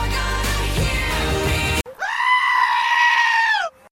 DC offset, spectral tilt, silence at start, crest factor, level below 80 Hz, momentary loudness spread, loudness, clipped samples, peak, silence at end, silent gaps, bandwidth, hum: under 0.1%; -3.5 dB/octave; 0 s; 14 dB; -28 dBFS; 7 LU; -18 LUFS; under 0.1%; -6 dBFS; 0.25 s; none; 16.5 kHz; none